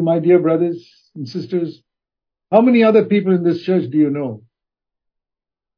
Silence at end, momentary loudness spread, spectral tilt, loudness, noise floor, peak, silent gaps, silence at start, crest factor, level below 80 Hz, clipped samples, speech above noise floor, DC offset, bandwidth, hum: 1.4 s; 16 LU; -9.5 dB/octave; -16 LUFS; -87 dBFS; 0 dBFS; none; 0 s; 18 dB; -70 dBFS; under 0.1%; 71 dB; under 0.1%; 5.4 kHz; none